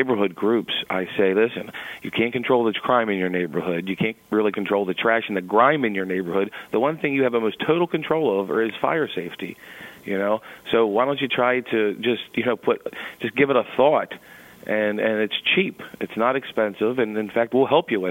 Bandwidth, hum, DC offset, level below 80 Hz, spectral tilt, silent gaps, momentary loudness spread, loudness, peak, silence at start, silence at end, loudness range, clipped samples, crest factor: 16.5 kHz; none; under 0.1%; -64 dBFS; -6.5 dB/octave; none; 9 LU; -22 LUFS; -2 dBFS; 0 s; 0 s; 2 LU; under 0.1%; 20 dB